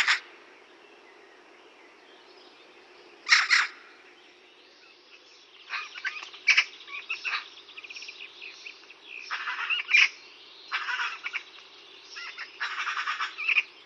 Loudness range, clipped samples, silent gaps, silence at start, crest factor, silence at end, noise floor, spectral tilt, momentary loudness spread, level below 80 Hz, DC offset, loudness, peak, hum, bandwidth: 5 LU; under 0.1%; none; 0 s; 28 dB; 0.05 s; -55 dBFS; 3.5 dB/octave; 25 LU; under -90 dBFS; under 0.1%; -26 LUFS; -4 dBFS; none; 10.5 kHz